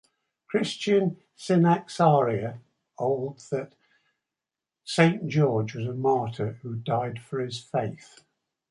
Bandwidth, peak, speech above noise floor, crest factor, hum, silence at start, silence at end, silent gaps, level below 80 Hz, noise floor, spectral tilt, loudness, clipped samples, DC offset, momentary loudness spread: 11.5 kHz; -4 dBFS; 64 dB; 24 dB; none; 0.5 s; 0.75 s; none; -66 dBFS; -89 dBFS; -6.5 dB/octave; -26 LUFS; under 0.1%; under 0.1%; 12 LU